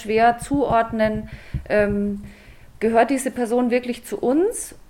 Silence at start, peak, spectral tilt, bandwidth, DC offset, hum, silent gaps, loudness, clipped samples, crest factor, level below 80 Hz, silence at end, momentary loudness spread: 0 s; -4 dBFS; -5.5 dB/octave; 17.5 kHz; under 0.1%; none; none; -21 LUFS; under 0.1%; 18 dB; -42 dBFS; 0.1 s; 11 LU